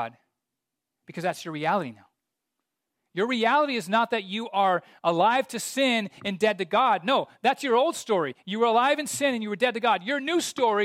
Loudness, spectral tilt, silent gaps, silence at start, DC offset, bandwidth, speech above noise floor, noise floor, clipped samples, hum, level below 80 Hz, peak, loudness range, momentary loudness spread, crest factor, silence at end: -25 LUFS; -3.5 dB/octave; none; 0 s; under 0.1%; 16 kHz; 61 dB; -85 dBFS; under 0.1%; none; -78 dBFS; -8 dBFS; 4 LU; 8 LU; 16 dB; 0 s